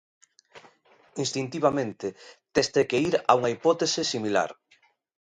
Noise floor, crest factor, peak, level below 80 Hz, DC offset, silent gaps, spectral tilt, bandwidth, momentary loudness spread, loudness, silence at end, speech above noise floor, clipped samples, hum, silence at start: -64 dBFS; 24 dB; -4 dBFS; -64 dBFS; under 0.1%; none; -4 dB/octave; 10.5 kHz; 11 LU; -26 LUFS; 0.85 s; 39 dB; under 0.1%; none; 0.55 s